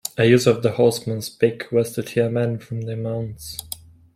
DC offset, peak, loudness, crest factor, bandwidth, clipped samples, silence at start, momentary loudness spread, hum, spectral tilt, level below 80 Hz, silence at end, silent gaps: under 0.1%; -2 dBFS; -21 LUFS; 18 dB; 16.5 kHz; under 0.1%; 0.05 s; 15 LU; none; -5.5 dB/octave; -54 dBFS; 0.4 s; none